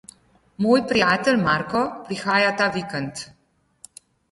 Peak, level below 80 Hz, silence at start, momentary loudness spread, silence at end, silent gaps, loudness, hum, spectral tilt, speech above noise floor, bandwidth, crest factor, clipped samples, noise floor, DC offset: -4 dBFS; -56 dBFS; 0.6 s; 11 LU; 1.05 s; none; -21 LUFS; none; -5 dB/octave; 30 dB; 11.5 kHz; 18 dB; under 0.1%; -51 dBFS; under 0.1%